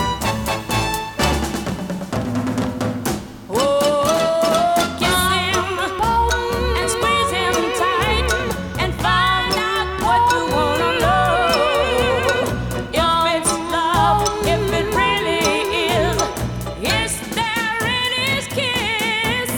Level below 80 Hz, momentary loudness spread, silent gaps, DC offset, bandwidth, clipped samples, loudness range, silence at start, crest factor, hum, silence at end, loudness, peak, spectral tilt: -32 dBFS; 7 LU; none; under 0.1%; over 20 kHz; under 0.1%; 3 LU; 0 s; 16 dB; none; 0 s; -18 LUFS; -2 dBFS; -3.5 dB/octave